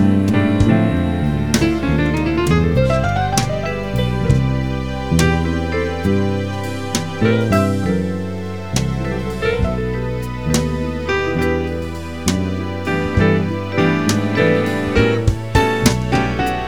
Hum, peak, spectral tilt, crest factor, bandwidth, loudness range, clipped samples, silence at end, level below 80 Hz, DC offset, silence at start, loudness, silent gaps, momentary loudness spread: none; 0 dBFS; -6 dB/octave; 18 dB; 18.5 kHz; 4 LU; under 0.1%; 0 s; -30 dBFS; 2%; 0 s; -18 LUFS; none; 7 LU